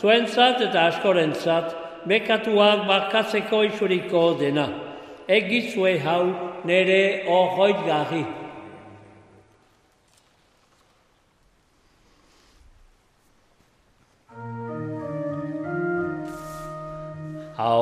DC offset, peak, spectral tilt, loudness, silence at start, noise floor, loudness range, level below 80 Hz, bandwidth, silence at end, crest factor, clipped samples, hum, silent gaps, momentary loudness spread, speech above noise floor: under 0.1%; -4 dBFS; -5.5 dB/octave; -22 LUFS; 0 s; -62 dBFS; 15 LU; -60 dBFS; 14 kHz; 0 s; 20 dB; under 0.1%; none; none; 17 LU; 41 dB